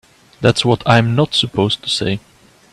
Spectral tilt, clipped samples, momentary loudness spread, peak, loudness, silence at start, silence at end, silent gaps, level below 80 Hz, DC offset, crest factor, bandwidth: -5 dB/octave; under 0.1%; 6 LU; 0 dBFS; -15 LUFS; 0.4 s; 0.55 s; none; -46 dBFS; under 0.1%; 16 dB; 12 kHz